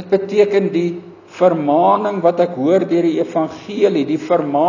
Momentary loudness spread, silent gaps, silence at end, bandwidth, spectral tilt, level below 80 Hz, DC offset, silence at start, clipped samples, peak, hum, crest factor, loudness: 7 LU; none; 0 s; 7.2 kHz; -7.5 dB/octave; -64 dBFS; under 0.1%; 0 s; under 0.1%; 0 dBFS; none; 16 dB; -16 LUFS